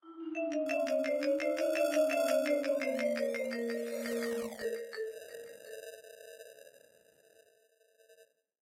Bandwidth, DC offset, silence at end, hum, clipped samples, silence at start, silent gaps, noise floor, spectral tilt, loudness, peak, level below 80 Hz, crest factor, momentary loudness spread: 16 kHz; under 0.1%; 0.5 s; none; under 0.1%; 0.05 s; none; -69 dBFS; -3 dB/octave; -34 LUFS; -18 dBFS; -82 dBFS; 16 dB; 19 LU